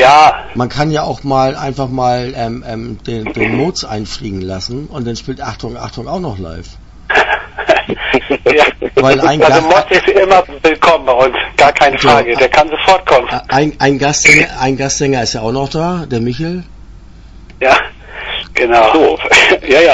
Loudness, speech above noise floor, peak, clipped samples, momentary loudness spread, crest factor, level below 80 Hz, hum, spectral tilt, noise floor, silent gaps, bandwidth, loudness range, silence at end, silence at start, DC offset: -11 LUFS; 23 dB; 0 dBFS; 0.4%; 14 LU; 12 dB; -34 dBFS; none; -4 dB/octave; -35 dBFS; none; 11 kHz; 10 LU; 0 s; 0 s; under 0.1%